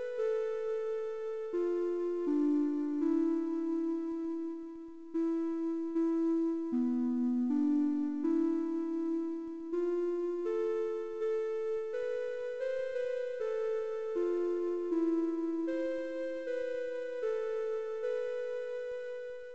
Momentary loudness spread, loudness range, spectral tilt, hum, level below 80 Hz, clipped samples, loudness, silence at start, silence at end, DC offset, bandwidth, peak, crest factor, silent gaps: 7 LU; 4 LU; -6 dB/octave; none; -74 dBFS; under 0.1%; -34 LUFS; 0 s; 0 s; 0.3%; 7.6 kHz; -22 dBFS; 12 dB; none